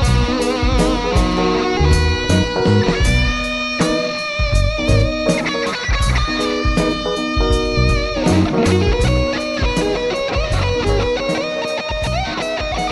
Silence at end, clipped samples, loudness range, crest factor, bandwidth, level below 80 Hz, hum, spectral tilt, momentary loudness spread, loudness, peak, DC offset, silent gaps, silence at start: 0 s; under 0.1%; 2 LU; 14 dB; 11.5 kHz; -22 dBFS; none; -5.5 dB/octave; 5 LU; -17 LUFS; -2 dBFS; under 0.1%; none; 0 s